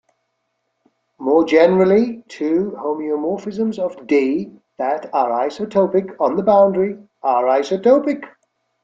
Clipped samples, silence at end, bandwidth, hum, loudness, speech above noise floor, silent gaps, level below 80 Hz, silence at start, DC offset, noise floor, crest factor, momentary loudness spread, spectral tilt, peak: under 0.1%; 0.55 s; 7.6 kHz; none; -18 LUFS; 55 dB; none; -62 dBFS; 1.2 s; under 0.1%; -72 dBFS; 16 dB; 11 LU; -7 dB/octave; -2 dBFS